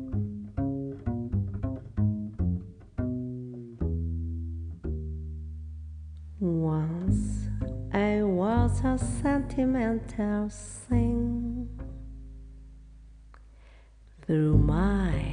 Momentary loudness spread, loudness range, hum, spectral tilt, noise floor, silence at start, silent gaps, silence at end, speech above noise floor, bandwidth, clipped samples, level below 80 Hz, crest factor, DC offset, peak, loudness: 16 LU; 8 LU; none; -8 dB/octave; -53 dBFS; 0 s; none; 0 s; 26 dB; 10 kHz; under 0.1%; -38 dBFS; 20 dB; under 0.1%; -10 dBFS; -30 LUFS